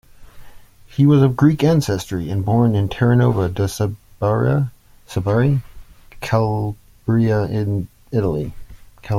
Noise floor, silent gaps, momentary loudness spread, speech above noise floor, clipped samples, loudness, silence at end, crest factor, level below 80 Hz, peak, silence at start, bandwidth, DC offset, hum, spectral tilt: -40 dBFS; none; 11 LU; 23 dB; under 0.1%; -18 LUFS; 0 s; 16 dB; -42 dBFS; -2 dBFS; 0.2 s; 15.5 kHz; under 0.1%; none; -7.5 dB/octave